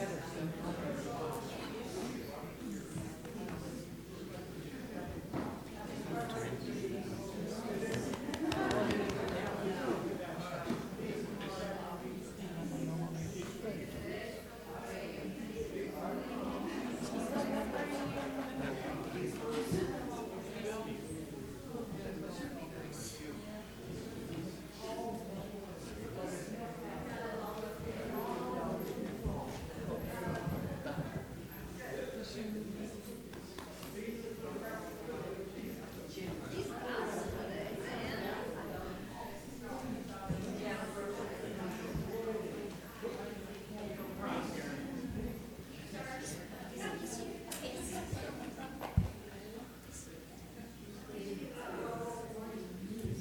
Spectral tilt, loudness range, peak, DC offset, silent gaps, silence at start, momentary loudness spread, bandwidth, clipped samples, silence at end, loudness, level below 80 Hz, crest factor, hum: -5.5 dB/octave; 7 LU; -16 dBFS; under 0.1%; none; 0 s; 8 LU; over 20 kHz; under 0.1%; 0 s; -42 LUFS; -56 dBFS; 26 dB; none